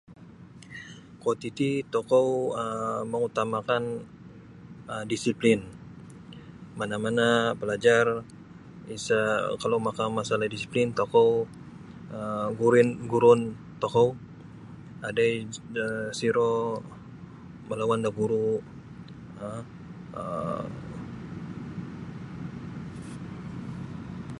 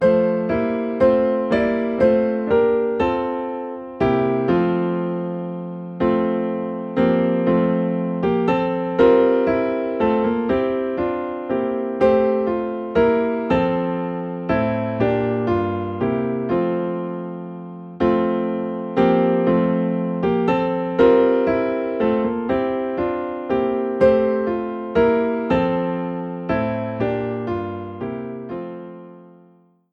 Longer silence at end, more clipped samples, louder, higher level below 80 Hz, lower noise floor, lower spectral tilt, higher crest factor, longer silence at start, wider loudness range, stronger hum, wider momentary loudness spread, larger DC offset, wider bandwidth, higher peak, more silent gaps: second, 0 s vs 0.65 s; neither; second, -27 LUFS vs -20 LUFS; second, -58 dBFS vs -48 dBFS; second, -48 dBFS vs -54 dBFS; second, -5.5 dB/octave vs -9.5 dB/octave; first, 22 dB vs 16 dB; about the same, 0.1 s vs 0 s; first, 12 LU vs 4 LU; neither; first, 23 LU vs 10 LU; neither; first, 11.5 kHz vs 6 kHz; about the same, -6 dBFS vs -4 dBFS; neither